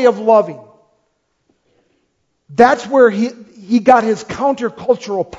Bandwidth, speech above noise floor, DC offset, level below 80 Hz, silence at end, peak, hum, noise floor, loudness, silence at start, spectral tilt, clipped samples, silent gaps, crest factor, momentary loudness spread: 7.8 kHz; 52 dB; under 0.1%; -54 dBFS; 0.05 s; 0 dBFS; none; -66 dBFS; -14 LUFS; 0 s; -5.5 dB/octave; 0.1%; none; 16 dB; 9 LU